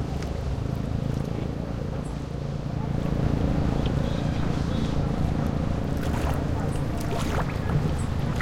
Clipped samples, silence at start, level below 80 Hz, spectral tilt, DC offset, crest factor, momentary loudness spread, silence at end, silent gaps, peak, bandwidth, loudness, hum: under 0.1%; 0 s; -32 dBFS; -7.5 dB/octave; under 0.1%; 14 dB; 5 LU; 0 s; none; -12 dBFS; 16 kHz; -28 LUFS; none